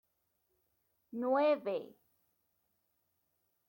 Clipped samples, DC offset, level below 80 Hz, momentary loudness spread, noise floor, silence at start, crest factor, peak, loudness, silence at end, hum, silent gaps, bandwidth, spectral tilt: under 0.1%; under 0.1%; under -90 dBFS; 12 LU; -81 dBFS; 1.15 s; 18 dB; -22 dBFS; -34 LUFS; 1.85 s; none; none; 16.5 kHz; -7 dB/octave